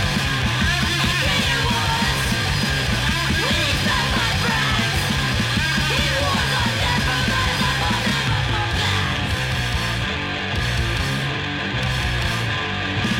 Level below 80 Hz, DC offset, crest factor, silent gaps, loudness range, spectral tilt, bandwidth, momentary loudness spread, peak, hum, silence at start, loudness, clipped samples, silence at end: -30 dBFS; under 0.1%; 14 dB; none; 3 LU; -4 dB/octave; 17 kHz; 4 LU; -6 dBFS; none; 0 s; -20 LUFS; under 0.1%; 0 s